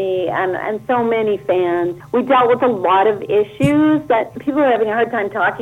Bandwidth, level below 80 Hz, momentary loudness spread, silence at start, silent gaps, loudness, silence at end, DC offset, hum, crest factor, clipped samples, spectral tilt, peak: 12.5 kHz; -52 dBFS; 6 LU; 0 s; none; -16 LUFS; 0 s; under 0.1%; none; 14 dB; under 0.1%; -7 dB/octave; -2 dBFS